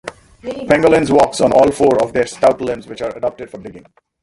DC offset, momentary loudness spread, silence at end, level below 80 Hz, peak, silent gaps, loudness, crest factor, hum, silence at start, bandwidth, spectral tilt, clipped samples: under 0.1%; 20 LU; 0.45 s; -44 dBFS; 0 dBFS; none; -14 LUFS; 16 dB; none; 0.05 s; 11.5 kHz; -5.5 dB/octave; under 0.1%